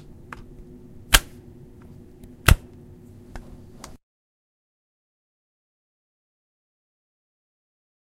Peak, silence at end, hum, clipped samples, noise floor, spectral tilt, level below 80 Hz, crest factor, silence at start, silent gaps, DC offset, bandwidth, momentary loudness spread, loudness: 0 dBFS; 4.6 s; none; under 0.1%; -45 dBFS; -2.5 dB/octave; -34 dBFS; 30 dB; 1.1 s; none; under 0.1%; 16 kHz; 27 LU; -20 LUFS